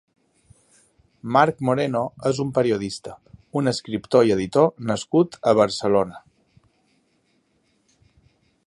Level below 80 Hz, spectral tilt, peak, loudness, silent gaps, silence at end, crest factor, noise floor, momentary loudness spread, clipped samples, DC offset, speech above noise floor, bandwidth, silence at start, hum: -58 dBFS; -6 dB/octave; -2 dBFS; -21 LUFS; none; 2.45 s; 20 dB; -66 dBFS; 11 LU; under 0.1%; under 0.1%; 46 dB; 11.5 kHz; 1.25 s; none